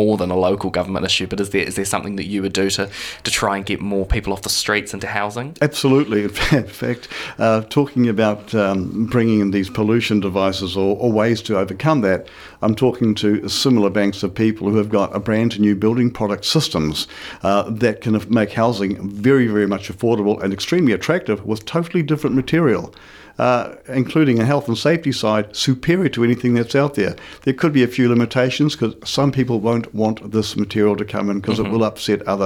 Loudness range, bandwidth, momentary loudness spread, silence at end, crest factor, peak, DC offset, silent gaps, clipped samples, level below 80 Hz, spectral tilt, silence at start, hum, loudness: 2 LU; 17 kHz; 6 LU; 0 s; 16 dB; -2 dBFS; under 0.1%; none; under 0.1%; -40 dBFS; -5.5 dB/octave; 0 s; none; -18 LUFS